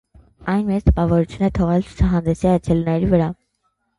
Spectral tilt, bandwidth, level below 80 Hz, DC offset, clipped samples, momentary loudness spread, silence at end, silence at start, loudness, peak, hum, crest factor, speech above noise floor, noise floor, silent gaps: -9 dB/octave; 11 kHz; -28 dBFS; under 0.1%; under 0.1%; 5 LU; 0.65 s; 0.4 s; -19 LUFS; 0 dBFS; none; 18 dB; 52 dB; -69 dBFS; none